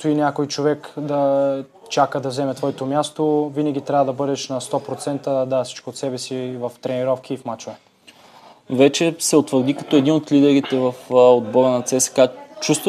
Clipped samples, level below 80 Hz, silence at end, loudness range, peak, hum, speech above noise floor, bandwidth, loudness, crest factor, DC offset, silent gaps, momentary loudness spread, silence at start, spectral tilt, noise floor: under 0.1%; -72 dBFS; 0 s; 8 LU; -2 dBFS; none; 29 dB; 14.5 kHz; -19 LUFS; 18 dB; under 0.1%; none; 11 LU; 0 s; -5 dB/octave; -48 dBFS